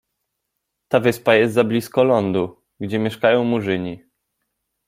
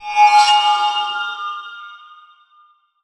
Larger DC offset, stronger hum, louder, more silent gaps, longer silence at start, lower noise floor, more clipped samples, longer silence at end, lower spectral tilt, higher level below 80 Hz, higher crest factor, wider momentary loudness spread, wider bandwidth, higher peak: neither; neither; second, -19 LUFS vs -15 LUFS; neither; first, 0.9 s vs 0 s; first, -78 dBFS vs -54 dBFS; neither; second, 0.9 s vs 1.1 s; first, -6.5 dB/octave vs 3.5 dB/octave; about the same, -62 dBFS vs -66 dBFS; about the same, 18 dB vs 16 dB; second, 12 LU vs 23 LU; first, 16 kHz vs 11.5 kHz; about the same, -2 dBFS vs -2 dBFS